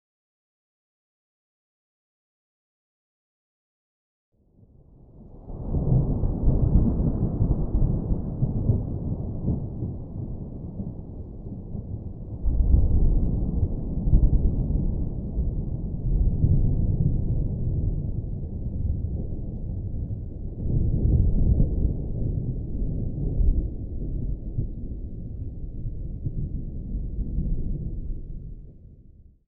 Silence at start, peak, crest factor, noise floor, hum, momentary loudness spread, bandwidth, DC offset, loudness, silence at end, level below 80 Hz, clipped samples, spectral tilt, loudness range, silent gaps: 5.15 s; -8 dBFS; 18 dB; -55 dBFS; none; 13 LU; 1.3 kHz; under 0.1%; -28 LUFS; 0.25 s; -28 dBFS; under 0.1%; -16.5 dB/octave; 8 LU; none